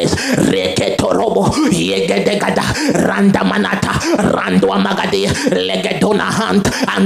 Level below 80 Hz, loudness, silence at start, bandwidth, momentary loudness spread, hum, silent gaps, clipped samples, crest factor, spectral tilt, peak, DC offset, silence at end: -40 dBFS; -14 LUFS; 0 s; 15.5 kHz; 3 LU; none; none; under 0.1%; 14 dB; -5 dB/octave; 0 dBFS; under 0.1%; 0 s